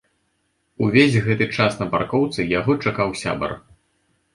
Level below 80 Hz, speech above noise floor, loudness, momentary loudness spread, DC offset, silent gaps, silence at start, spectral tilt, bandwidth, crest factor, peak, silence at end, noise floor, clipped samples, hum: -50 dBFS; 49 dB; -20 LUFS; 9 LU; under 0.1%; none; 0.8 s; -6 dB/octave; 11.5 kHz; 20 dB; -2 dBFS; 0.75 s; -69 dBFS; under 0.1%; none